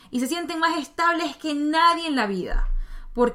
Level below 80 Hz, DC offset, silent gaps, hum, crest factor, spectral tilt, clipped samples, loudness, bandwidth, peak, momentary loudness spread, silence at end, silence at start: -32 dBFS; under 0.1%; none; none; 16 dB; -4 dB/octave; under 0.1%; -23 LUFS; 15.5 kHz; -8 dBFS; 12 LU; 0 s; 0.1 s